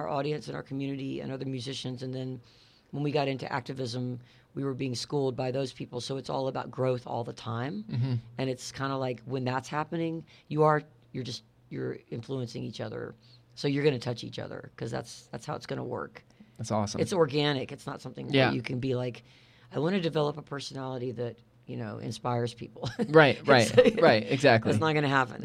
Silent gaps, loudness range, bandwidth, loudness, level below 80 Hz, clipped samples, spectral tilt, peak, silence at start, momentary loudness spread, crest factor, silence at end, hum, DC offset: none; 10 LU; 13.5 kHz; -30 LUFS; -66 dBFS; under 0.1%; -5.5 dB/octave; -6 dBFS; 0 s; 17 LU; 24 dB; 0 s; none; under 0.1%